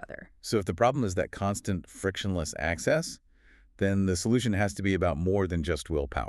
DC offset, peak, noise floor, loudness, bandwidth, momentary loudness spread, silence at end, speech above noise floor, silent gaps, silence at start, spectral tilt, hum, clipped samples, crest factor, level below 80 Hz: under 0.1%; -10 dBFS; -59 dBFS; -29 LUFS; 13 kHz; 7 LU; 0 s; 31 dB; none; 0 s; -5.5 dB/octave; none; under 0.1%; 20 dB; -44 dBFS